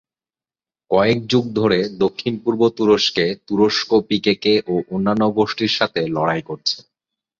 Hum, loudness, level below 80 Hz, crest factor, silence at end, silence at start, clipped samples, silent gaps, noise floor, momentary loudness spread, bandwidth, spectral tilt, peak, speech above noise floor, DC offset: none; -18 LUFS; -54 dBFS; 16 dB; 0.6 s; 0.9 s; under 0.1%; none; under -90 dBFS; 6 LU; 7.6 kHz; -5.5 dB/octave; -2 dBFS; over 72 dB; under 0.1%